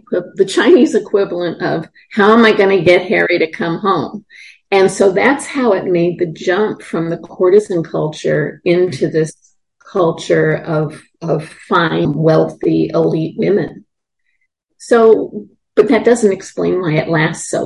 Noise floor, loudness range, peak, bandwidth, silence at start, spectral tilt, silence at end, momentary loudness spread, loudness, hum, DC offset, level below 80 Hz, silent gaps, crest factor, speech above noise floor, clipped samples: -68 dBFS; 4 LU; 0 dBFS; 11.5 kHz; 0.1 s; -6 dB/octave; 0 s; 10 LU; -14 LUFS; none; under 0.1%; -54 dBFS; none; 14 dB; 55 dB; under 0.1%